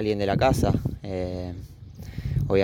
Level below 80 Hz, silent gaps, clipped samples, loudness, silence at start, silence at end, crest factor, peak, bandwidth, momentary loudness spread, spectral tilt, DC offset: -38 dBFS; none; under 0.1%; -26 LUFS; 0 s; 0 s; 18 dB; -8 dBFS; 17 kHz; 19 LU; -7 dB/octave; under 0.1%